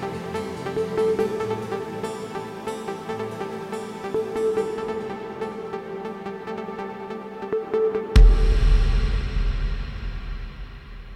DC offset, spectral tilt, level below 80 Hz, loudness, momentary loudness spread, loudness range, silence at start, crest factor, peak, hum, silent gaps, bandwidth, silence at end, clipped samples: under 0.1%; -7 dB/octave; -24 dBFS; -26 LUFS; 12 LU; 6 LU; 0 s; 22 dB; -2 dBFS; none; none; 10.5 kHz; 0 s; under 0.1%